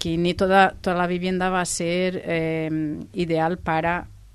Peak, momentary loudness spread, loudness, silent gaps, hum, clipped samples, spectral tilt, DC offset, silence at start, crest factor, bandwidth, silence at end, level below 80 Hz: -4 dBFS; 9 LU; -23 LUFS; none; none; under 0.1%; -5 dB/octave; under 0.1%; 0 s; 20 dB; 12.5 kHz; 0.15 s; -46 dBFS